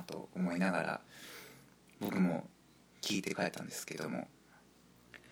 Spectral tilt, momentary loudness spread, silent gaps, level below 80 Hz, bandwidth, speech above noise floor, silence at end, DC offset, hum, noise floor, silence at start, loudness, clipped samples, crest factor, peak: -5 dB/octave; 18 LU; none; -76 dBFS; over 20 kHz; 27 dB; 0 s; under 0.1%; 60 Hz at -55 dBFS; -64 dBFS; 0 s; -38 LUFS; under 0.1%; 22 dB; -18 dBFS